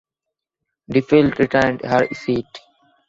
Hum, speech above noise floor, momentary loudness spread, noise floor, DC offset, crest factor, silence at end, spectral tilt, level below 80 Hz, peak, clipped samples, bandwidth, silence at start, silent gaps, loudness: none; 66 dB; 9 LU; -83 dBFS; under 0.1%; 18 dB; 0.5 s; -7 dB/octave; -50 dBFS; -2 dBFS; under 0.1%; 7.8 kHz; 0.9 s; none; -18 LUFS